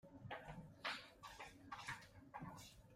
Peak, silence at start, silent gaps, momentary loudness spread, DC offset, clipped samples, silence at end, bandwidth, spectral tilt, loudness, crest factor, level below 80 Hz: -32 dBFS; 0.05 s; none; 10 LU; under 0.1%; under 0.1%; 0 s; 16 kHz; -3.5 dB/octave; -53 LUFS; 22 dB; -72 dBFS